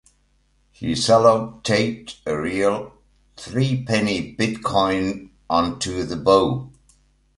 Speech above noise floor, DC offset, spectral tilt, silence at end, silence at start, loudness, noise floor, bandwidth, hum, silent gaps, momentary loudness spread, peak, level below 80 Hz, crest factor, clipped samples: 42 dB; under 0.1%; -5 dB/octave; 0.7 s; 0.8 s; -21 LUFS; -62 dBFS; 11.5 kHz; none; none; 13 LU; -2 dBFS; -48 dBFS; 20 dB; under 0.1%